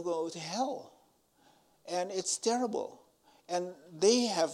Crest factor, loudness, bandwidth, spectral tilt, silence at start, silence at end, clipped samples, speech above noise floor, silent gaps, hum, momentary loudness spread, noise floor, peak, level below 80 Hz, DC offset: 22 dB; -32 LUFS; 14 kHz; -3 dB/octave; 0 s; 0 s; under 0.1%; 35 dB; none; none; 16 LU; -68 dBFS; -12 dBFS; -84 dBFS; under 0.1%